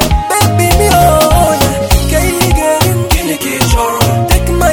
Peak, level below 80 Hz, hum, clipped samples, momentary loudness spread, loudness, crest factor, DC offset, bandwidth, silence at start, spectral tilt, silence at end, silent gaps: 0 dBFS; -16 dBFS; none; 0.4%; 5 LU; -10 LUFS; 10 dB; 0.8%; over 20 kHz; 0 s; -4.5 dB/octave; 0 s; none